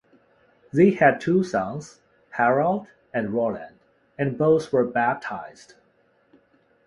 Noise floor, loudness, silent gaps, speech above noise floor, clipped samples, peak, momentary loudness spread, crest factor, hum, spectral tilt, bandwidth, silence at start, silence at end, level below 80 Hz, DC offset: -63 dBFS; -23 LUFS; none; 41 dB; under 0.1%; -4 dBFS; 16 LU; 20 dB; none; -7.5 dB/octave; 11 kHz; 0.75 s; 1.35 s; -62 dBFS; under 0.1%